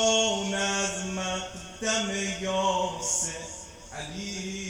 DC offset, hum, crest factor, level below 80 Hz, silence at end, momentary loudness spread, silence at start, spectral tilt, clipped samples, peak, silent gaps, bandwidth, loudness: under 0.1%; none; 16 dB; -52 dBFS; 0 s; 12 LU; 0 s; -2 dB/octave; under 0.1%; -12 dBFS; none; 19.5 kHz; -28 LUFS